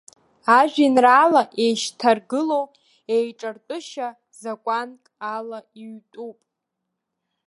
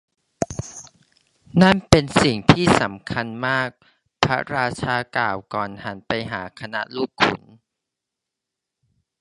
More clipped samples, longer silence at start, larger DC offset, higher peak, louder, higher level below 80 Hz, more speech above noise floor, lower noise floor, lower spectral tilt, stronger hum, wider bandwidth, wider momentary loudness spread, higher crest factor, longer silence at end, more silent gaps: neither; about the same, 0.45 s vs 0.4 s; neither; about the same, -2 dBFS vs 0 dBFS; about the same, -20 LUFS vs -21 LUFS; second, -80 dBFS vs -44 dBFS; second, 60 dB vs 64 dB; second, -80 dBFS vs -84 dBFS; second, -3.5 dB/octave vs -5 dB/octave; neither; about the same, 11.5 kHz vs 11.5 kHz; first, 22 LU vs 14 LU; about the same, 20 dB vs 22 dB; second, 1.15 s vs 1.85 s; neither